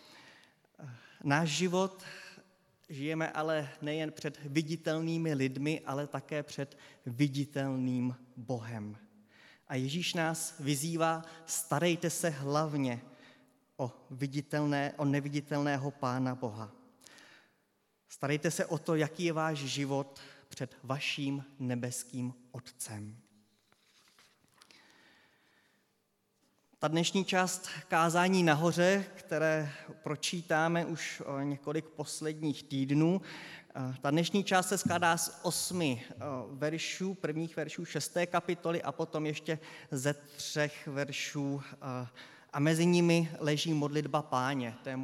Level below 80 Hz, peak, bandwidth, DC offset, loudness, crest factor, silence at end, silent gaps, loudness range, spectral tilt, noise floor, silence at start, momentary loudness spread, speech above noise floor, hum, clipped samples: -82 dBFS; -12 dBFS; 16 kHz; under 0.1%; -34 LUFS; 22 dB; 0 s; none; 7 LU; -5 dB/octave; -77 dBFS; 0.05 s; 13 LU; 44 dB; none; under 0.1%